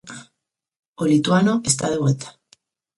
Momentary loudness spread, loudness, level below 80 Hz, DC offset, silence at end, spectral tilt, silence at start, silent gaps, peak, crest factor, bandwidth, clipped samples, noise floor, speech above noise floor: 21 LU; -19 LUFS; -58 dBFS; under 0.1%; 0.7 s; -5 dB/octave; 0.05 s; 0.79-0.94 s; -4 dBFS; 18 dB; 11.5 kHz; under 0.1%; -80 dBFS; 62 dB